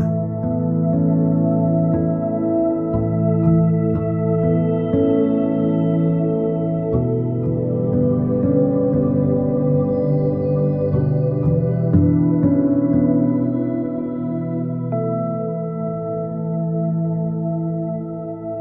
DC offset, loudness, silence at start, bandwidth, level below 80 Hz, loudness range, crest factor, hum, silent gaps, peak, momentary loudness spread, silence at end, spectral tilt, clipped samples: under 0.1%; -19 LUFS; 0 s; 3.3 kHz; -42 dBFS; 5 LU; 14 dB; none; none; -4 dBFS; 7 LU; 0 s; -13.5 dB/octave; under 0.1%